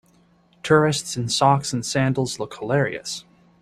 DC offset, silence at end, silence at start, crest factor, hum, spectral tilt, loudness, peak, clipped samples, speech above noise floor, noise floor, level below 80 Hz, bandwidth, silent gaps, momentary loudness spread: under 0.1%; 0.4 s; 0.65 s; 20 dB; none; -4.5 dB/octave; -21 LUFS; -4 dBFS; under 0.1%; 37 dB; -58 dBFS; -56 dBFS; 13.5 kHz; none; 13 LU